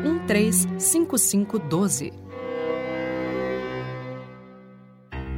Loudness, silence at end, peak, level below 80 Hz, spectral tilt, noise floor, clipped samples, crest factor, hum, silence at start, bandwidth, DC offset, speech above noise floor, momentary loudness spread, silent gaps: -23 LUFS; 0 s; -8 dBFS; -48 dBFS; -4.5 dB/octave; -48 dBFS; under 0.1%; 16 dB; none; 0 s; 16.5 kHz; under 0.1%; 26 dB; 17 LU; none